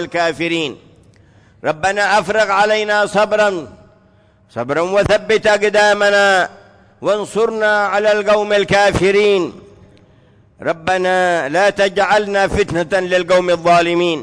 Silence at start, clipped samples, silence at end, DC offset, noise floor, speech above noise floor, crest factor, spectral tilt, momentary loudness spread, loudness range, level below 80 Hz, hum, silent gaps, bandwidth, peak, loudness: 0 s; under 0.1%; 0 s; under 0.1%; -51 dBFS; 36 dB; 12 dB; -4 dB/octave; 8 LU; 2 LU; -42 dBFS; none; none; 11 kHz; -4 dBFS; -14 LUFS